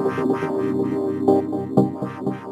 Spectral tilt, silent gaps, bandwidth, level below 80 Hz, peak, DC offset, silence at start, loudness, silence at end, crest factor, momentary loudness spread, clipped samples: -9 dB/octave; none; 12 kHz; -64 dBFS; -2 dBFS; under 0.1%; 0 s; -22 LUFS; 0 s; 18 dB; 8 LU; under 0.1%